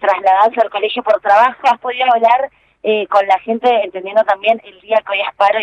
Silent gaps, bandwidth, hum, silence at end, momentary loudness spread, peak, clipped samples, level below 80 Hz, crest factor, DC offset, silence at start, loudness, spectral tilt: none; 8.4 kHz; none; 0 s; 6 LU; 0 dBFS; under 0.1%; -64 dBFS; 14 dB; under 0.1%; 0 s; -14 LUFS; -4 dB/octave